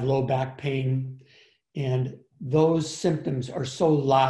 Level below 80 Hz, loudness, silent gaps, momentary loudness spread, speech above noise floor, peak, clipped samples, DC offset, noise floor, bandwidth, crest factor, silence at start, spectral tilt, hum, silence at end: -60 dBFS; -26 LUFS; none; 11 LU; 34 dB; -8 dBFS; under 0.1%; under 0.1%; -59 dBFS; 11 kHz; 16 dB; 0 s; -6.5 dB/octave; none; 0 s